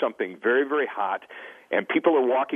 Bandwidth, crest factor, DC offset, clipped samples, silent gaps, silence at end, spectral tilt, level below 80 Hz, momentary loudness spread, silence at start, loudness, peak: 3.7 kHz; 18 dB; under 0.1%; under 0.1%; none; 0 s; -6.5 dB/octave; -84 dBFS; 12 LU; 0 s; -24 LUFS; -6 dBFS